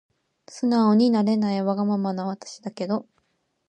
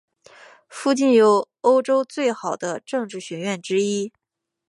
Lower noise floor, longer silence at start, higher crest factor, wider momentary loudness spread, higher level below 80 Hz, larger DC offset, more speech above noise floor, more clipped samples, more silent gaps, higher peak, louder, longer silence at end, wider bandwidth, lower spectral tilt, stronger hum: first, -71 dBFS vs -49 dBFS; second, 0.5 s vs 0.7 s; about the same, 16 dB vs 18 dB; about the same, 14 LU vs 13 LU; about the same, -74 dBFS vs -78 dBFS; neither; first, 48 dB vs 28 dB; neither; neither; second, -8 dBFS vs -4 dBFS; about the same, -23 LUFS vs -21 LUFS; about the same, 0.65 s vs 0.6 s; second, 9.2 kHz vs 11.5 kHz; first, -7 dB/octave vs -4.5 dB/octave; neither